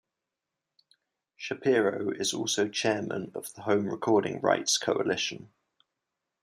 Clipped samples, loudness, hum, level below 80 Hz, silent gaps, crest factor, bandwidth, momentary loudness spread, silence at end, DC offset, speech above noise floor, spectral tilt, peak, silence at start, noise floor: under 0.1%; -28 LUFS; none; -76 dBFS; none; 20 dB; 15 kHz; 11 LU; 0.95 s; under 0.1%; 59 dB; -3 dB/octave; -10 dBFS; 1.4 s; -87 dBFS